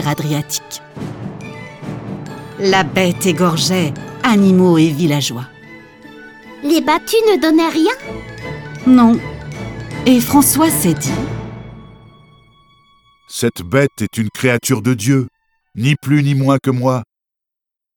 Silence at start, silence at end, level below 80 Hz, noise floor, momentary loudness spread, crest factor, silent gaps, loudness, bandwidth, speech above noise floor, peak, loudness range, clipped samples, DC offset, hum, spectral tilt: 0 s; 0.9 s; -46 dBFS; -84 dBFS; 18 LU; 16 dB; none; -14 LUFS; 19 kHz; 71 dB; 0 dBFS; 6 LU; under 0.1%; under 0.1%; none; -5 dB/octave